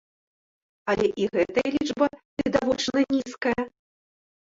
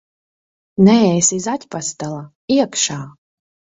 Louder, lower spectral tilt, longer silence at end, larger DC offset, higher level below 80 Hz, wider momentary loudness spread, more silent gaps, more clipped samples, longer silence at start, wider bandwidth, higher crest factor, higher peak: second, -25 LUFS vs -16 LUFS; about the same, -4.5 dB/octave vs -4.5 dB/octave; first, 0.8 s vs 0.65 s; neither; about the same, -56 dBFS vs -56 dBFS; second, 6 LU vs 18 LU; about the same, 2.25-2.37 s vs 2.35-2.48 s; neither; about the same, 0.85 s vs 0.8 s; about the same, 7.8 kHz vs 8 kHz; about the same, 20 dB vs 18 dB; second, -6 dBFS vs 0 dBFS